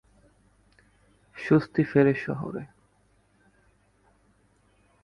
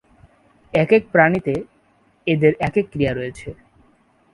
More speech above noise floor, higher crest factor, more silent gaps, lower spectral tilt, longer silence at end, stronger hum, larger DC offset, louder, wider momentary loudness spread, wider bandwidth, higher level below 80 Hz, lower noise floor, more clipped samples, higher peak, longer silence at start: about the same, 41 dB vs 41 dB; about the same, 24 dB vs 20 dB; neither; first, -9 dB/octave vs -7.5 dB/octave; first, 2.35 s vs 0.8 s; first, 50 Hz at -60 dBFS vs none; neither; second, -25 LUFS vs -19 LUFS; first, 21 LU vs 14 LU; about the same, 10.5 kHz vs 11 kHz; second, -62 dBFS vs -48 dBFS; first, -65 dBFS vs -59 dBFS; neither; second, -6 dBFS vs 0 dBFS; first, 1.35 s vs 0.75 s